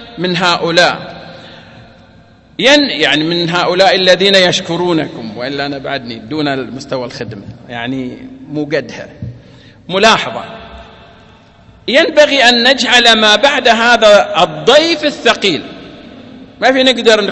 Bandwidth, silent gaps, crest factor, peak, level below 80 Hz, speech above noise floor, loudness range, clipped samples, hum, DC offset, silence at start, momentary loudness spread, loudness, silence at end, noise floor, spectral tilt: 11 kHz; none; 12 dB; 0 dBFS; -46 dBFS; 31 dB; 12 LU; 0.5%; none; under 0.1%; 0 s; 20 LU; -10 LUFS; 0 s; -42 dBFS; -3.5 dB/octave